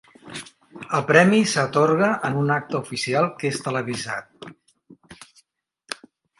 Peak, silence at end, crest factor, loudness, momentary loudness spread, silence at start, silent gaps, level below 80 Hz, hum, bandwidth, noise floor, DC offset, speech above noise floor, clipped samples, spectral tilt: 0 dBFS; 0.45 s; 24 dB; -21 LUFS; 22 LU; 0.25 s; none; -66 dBFS; none; 11.5 kHz; -64 dBFS; under 0.1%; 43 dB; under 0.1%; -5 dB/octave